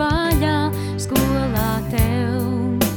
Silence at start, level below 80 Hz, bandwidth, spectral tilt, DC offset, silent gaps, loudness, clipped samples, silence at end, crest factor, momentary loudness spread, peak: 0 s; -30 dBFS; over 20 kHz; -5.5 dB/octave; under 0.1%; none; -20 LUFS; under 0.1%; 0 s; 16 dB; 3 LU; -4 dBFS